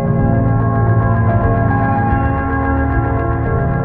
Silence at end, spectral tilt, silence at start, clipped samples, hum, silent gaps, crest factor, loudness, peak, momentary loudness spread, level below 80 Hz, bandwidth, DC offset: 0 s; -13 dB/octave; 0 s; under 0.1%; none; none; 12 dB; -15 LUFS; -2 dBFS; 3 LU; -22 dBFS; 3.2 kHz; under 0.1%